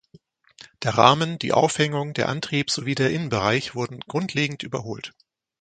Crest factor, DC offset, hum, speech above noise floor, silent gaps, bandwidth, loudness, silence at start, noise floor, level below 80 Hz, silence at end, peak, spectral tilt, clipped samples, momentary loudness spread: 24 dB; under 0.1%; none; 32 dB; none; 9.4 kHz; -23 LUFS; 0.8 s; -55 dBFS; -56 dBFS; 0.5 s; 0 dBFS; -4.5 dB/octave; under 0.1%; 13 LU